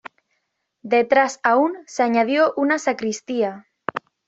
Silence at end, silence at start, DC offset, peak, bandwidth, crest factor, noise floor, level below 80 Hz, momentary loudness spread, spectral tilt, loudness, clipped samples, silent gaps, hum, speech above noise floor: 0.3 s; 0.85 s; under 0.1%; -4 dBFS; 8.2 kHz; 18 dB; -74 dBFS; -70 dBFS; 12 LU; -4 dB/octave; -20 LUFS; under 0.1%; none; none; 54 dB